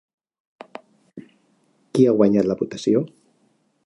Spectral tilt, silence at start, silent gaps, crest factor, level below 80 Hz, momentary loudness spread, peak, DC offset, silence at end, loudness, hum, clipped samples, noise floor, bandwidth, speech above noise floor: -7.5 dB/octave; 1.15 s; none; 20 dB; -62 dBFS; 25 LU; -4 dBFS; under 0.1%; 0.8 s; -19 LUFS; none; under 0.1%; -64 dBFS; 11.5 kHz; 46 dB